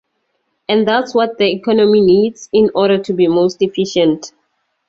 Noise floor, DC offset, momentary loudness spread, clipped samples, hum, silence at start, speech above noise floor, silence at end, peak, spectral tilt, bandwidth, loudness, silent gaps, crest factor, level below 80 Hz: -67 dBFS; under 0.1%; 7 LU; under 0.1%; none; 0.7 s; 54 dB; 0.6 s; -2 dBFS; -5.5 dB/octave; 7.6 kHz; -14 LUFS; none; 12 dB; -54 dBFS